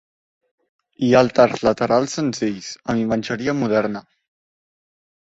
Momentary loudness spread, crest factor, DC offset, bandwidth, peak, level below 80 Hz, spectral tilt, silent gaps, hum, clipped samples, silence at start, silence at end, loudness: 10 LU; 20 dB; under 0.1%; 8 kHz; -2 dBFS; -54 dBFS; -5.5 dB/octave; none; none; under 0.1%; 1 s; 1.25 s; -19 LUFS